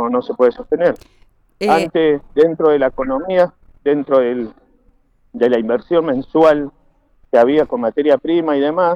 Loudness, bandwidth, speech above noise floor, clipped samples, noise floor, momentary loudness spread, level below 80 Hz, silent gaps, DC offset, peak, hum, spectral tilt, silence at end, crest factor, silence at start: -16 LUFS; 10.5 kHz; 40 dB; under 0.1%; -54 dBFS; 8 LU; -48 dBFS; none; under 0.1%; -2 dBFS; none; -7 dB/octave; 0 s; 12 dB; 0 s